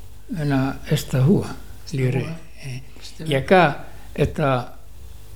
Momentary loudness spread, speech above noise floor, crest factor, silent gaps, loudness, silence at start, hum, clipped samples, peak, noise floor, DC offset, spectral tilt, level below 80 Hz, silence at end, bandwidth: 19 LU; 21 dB; 22 dB; none; -21 LUFS; 0 s; none; under 0.1%; -2 dBFS; -41 dBFS; 2%; -6.5 dB/octave; -42 dBFS; 0 s; 17.5 kHz